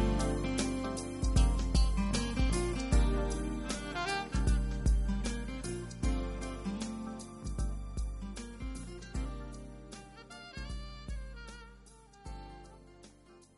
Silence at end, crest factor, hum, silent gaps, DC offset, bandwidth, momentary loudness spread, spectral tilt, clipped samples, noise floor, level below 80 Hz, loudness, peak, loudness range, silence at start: 0.2 s; 18 dB; none; none; under 0.1%; 11.5 kHz; 18 LU; -5.5 dB/octave; under 0.1%; -59 dBFS; -36 dBFS; -35 LUFS; -16 dBFS; 15 LU; 0 s